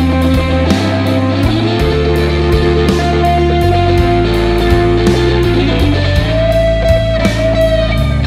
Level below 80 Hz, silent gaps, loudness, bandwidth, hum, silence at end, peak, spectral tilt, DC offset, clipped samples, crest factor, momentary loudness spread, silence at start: -18 dBFS; none; -12 LUFS; 15 kHz; none; 0 s; 0 dBFS; -7 dB/octave; under 0.1%; under 0.1%; 10 dB; 2 LU; 0 s